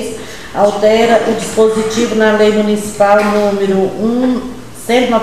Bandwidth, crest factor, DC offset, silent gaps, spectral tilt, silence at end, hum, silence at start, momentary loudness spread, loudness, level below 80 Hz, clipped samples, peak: 14.5 kHz; 12 dB; 2%; none; -5 dB/octave; 0 s; none; 0 s; 11 LU; -12 LUFS; -42 dBFS; under 0.1%; 0 dBFS